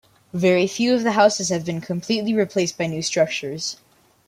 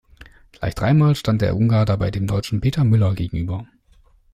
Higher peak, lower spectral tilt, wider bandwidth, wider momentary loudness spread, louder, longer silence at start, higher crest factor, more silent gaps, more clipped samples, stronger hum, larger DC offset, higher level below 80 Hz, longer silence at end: first, -2 dBFS vs -6 dBFS; second, -4.5 dB/octave vs -8 dB/octave; about the same, 15.5 kHz vs 14.5 kHz; about the same, 11 LU vs 11 LU; about the same, -21 LUFS vs -20 LUFS; second, 0.35 s vs 0.6 s; first, 18 dB vs 12 dB; neither; neither; neither; neither; second, -64 dBFS vs -40 dBFS; second, 0.55 s vs 0.7 s